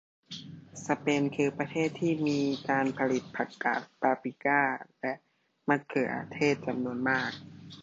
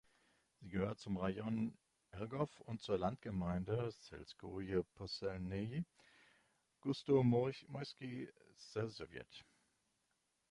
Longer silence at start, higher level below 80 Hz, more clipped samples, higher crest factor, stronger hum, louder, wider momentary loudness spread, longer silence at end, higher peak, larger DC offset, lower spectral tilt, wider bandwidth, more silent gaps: second, 0.3 s vs 0.6 s; second, -72 dBFS vs -64 dBFS; neither; about the same, 20 dB vs 20 dB; neither; first, -30 LUFS vs -42 LUFS; second, 15 LU vs 18 LU; second, 0 s vs 1.1 s; first, -10 dBFS vs -22 dBFS; neither; second, -5.5 dB/octave vs -7.5 dB/octave; second, 8 kHz vs 11.5 kHz; neither